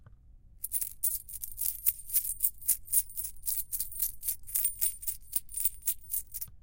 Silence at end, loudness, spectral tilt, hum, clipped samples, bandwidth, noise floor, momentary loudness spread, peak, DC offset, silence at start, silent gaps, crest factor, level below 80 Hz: 0.05 s; -30 LUFS; 1.5 dB/octave; none; under 0.1%; 17.5 kHz; -55 dBFS; 8 LU; -10 dBFS; under 0.1%; 0 s; none; 24 dB; -54 dBFS